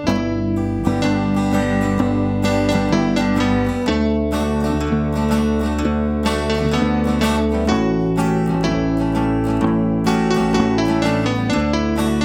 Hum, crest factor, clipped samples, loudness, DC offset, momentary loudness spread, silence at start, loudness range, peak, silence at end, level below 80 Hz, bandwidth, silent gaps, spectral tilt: none; 14 dB; under 0.1%; -18 LUFS; under 0.1%; 2 LU; 0 s; 1 LU; -4 dBFS; 0 s; -30 dBFS; 16.5 kHz; none; -6.5 dB/octave